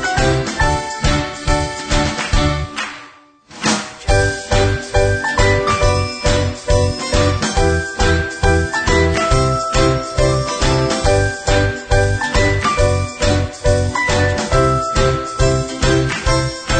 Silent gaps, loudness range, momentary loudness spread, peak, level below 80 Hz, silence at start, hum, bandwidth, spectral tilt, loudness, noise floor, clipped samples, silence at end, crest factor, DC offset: none; 3 LU; 4 LU; 0 dBFS; -22 dBFS; 0 s; none; 9.4 kHz; -4.5 dB/octave; -16 LUFS; -43 dBFS; under 0.1%; 0 s; 14 dB; under 0.1%